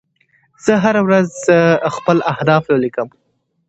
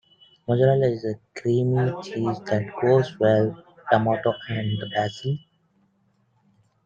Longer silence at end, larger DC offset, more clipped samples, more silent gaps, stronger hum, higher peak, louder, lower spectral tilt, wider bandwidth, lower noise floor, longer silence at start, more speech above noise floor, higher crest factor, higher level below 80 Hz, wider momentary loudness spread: second, 0.6 s vs 1.45 s; neither; neither; neither; neither; first, 0 dBFS vs -4 dBFS; first, -15 LUFS vs -23 LUFS; second, -6.5 dB/octave vs -8 dB/octave; first, 8.2 kHz vs 7.4 kHz; second, -58 dBFS vs -66 dBFS; first, 0.65 s vs 0.5 s; about the same, 45 dB vs 44 dB; about the same, 16 dB vs 20 dB; first, -56 dBFS vs -62 dBFS; about the same, 9 LU vs 10 LU